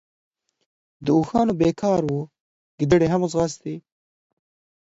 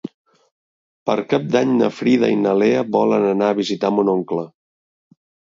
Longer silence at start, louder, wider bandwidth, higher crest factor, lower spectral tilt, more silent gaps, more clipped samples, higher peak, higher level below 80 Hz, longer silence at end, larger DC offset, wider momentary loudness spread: first, 1 s vs 0.05 s; second, -21 LUFS vs -18 LUFS; about the same, 8 kHz vs 7.6 kHz; about the same, 20 dB vs 16 dB; about the same, -7 dB/octave vs -6.5 dB/octave; second, 2.40-2.78 s vs 0.14-0.25 s, 0.51-1.06 s; neither; about the same, -4 dBFS vs -2 dBFS; first, -50 dBFS vs -66 dBFS; about the same, 1.05 s vs 1.1 s; neither; first, 15 LU vs 10 LU